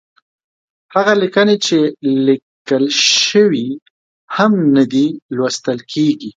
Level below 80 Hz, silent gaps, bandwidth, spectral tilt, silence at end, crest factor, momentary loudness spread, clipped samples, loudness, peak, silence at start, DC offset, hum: -64 dBFS; 2.42-2.65 s, 3.82-4.28 s, 5.22-5.29 s; 9.2 kHz; -4 dB/octave; 0.05 s; 14 dB; 10 LU; under 0.1%; -14 LUFS; 0 dBFS; 0.9 s; under 0.1%; none